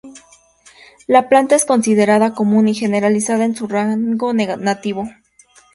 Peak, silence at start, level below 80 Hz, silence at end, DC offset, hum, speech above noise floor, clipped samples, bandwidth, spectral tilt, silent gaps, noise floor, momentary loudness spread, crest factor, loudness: 0 dBFS; 0.05 s; -60 dBFS; 0.65 s; under 0.1%; none; 35 dB; under 0.1%; 11.5 kHz; -5 dB/octave; none; -50 dBFS; 9 LU; 16 dB; -15 LUFS